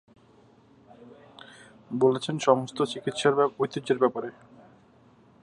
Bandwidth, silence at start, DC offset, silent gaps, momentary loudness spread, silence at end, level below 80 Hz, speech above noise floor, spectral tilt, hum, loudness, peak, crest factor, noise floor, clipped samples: 11 kHz; 1.05 s; under 0.1%; none; 24 LU; 1.1 s; -72 dBFS; 32 dB; -5.5 dB/octave; none; -26 LUFS; -6 dBFS; 22 dB; -58 dBFS; under 0.1%